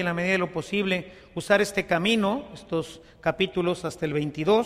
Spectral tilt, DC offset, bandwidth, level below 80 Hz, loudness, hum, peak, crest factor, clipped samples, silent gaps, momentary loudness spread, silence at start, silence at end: -5 dB/octave; under 0.1%; 15 kHz; -54 dBFS; -26 LUFS; none; -8 dBFS; 18 dB; under 0.1%; none; 9 LU; 0 s; 0 s